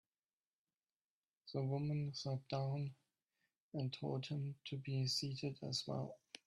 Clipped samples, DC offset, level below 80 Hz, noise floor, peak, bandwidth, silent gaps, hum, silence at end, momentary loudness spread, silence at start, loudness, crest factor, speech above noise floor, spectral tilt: under 0.1%; under 0.1%; -78 dBFS; under -90 dBFS; -28 dBFS; 12.5 kHz; 3.60-3.72 s; none; 0.3 s; 8 LU; 1.45 s; -43 LUFS; 16 dB; over 48 dB; -5.5 dB/octave